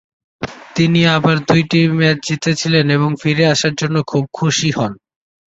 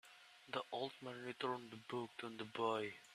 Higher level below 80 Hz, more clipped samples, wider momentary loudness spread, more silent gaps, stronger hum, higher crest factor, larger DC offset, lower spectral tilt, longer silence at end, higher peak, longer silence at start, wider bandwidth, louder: first, -50 dBFS vs -88 dBFS; neither; about the same, 9 LU vs 9 LU; neither; neither; second, 14 dB vs 20 dB; neither; about the same, -5 dB/octave vs -5 dB/octave; first, 0.65 s vs 0 s; first, 0 dBFS vs -26 dBFS; first, 0.4 s vs 0.05 s; second, 8 kHz vs 13.5 kHz; first, -15 LUFS vs -46 LUFS